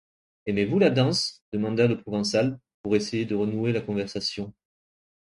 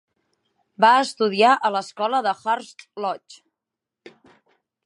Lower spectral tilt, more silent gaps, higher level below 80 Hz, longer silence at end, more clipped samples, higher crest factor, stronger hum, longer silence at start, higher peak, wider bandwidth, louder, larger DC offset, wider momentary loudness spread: first, -5.5 dB/octave vs -3.5 dB/octave; first, 1.41-1.52 s, 2.74-2.84 s vs none; first, -58 dBFS vs -82 dBFS; second, 0.75 s vs 1.55 s; neither; about the same, 20 dB vs 20 dB; neither; second, 0.45 s vs 0.8 s; second, -6 dBFS vs -2 dBFS; about the same, 11.5 kHz vs 11.5 kHz; second, -25 LUFS vs -20 LUFS; neither; second, 9 LU vs 13 LU